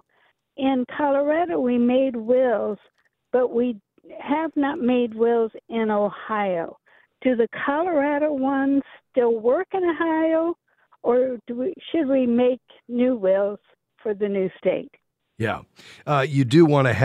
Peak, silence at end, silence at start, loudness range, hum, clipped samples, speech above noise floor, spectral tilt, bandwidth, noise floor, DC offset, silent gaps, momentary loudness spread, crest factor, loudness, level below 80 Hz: -2 dBFS; 0 s; 0.6 s; 2 LU; none; under 0.1%; 43 dB; -8 dB/octave; 10.5 kHz; -65 dBFS; under 0.1%; none; 9 LU; 20 dB; -22 LUFS; -64 dBFS